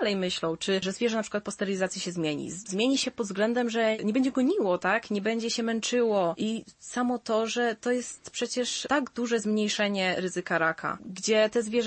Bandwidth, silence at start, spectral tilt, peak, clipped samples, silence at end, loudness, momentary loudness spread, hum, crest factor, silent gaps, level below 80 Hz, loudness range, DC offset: 8.8 kHz; 0 s; -4 dB/octave; -12 dBFS; under 0.1%; 0 s; -28 LUFS; 6 LU; none; 16 dB; none; -68 dBFS; 2 LU; under 0.1%